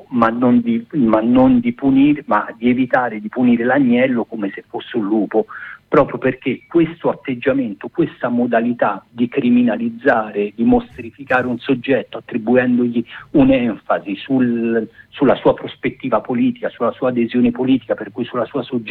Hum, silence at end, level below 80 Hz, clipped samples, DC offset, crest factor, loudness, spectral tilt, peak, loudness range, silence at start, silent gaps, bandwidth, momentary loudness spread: none; 0 s; -48 dBFS; under 0.1%; under 0.1%; 14 dB; -17 LUFS; -9 dB/octave; -2 dBFS; 4 LU; 0.1 s; none; 4.2 kHz; 9 LU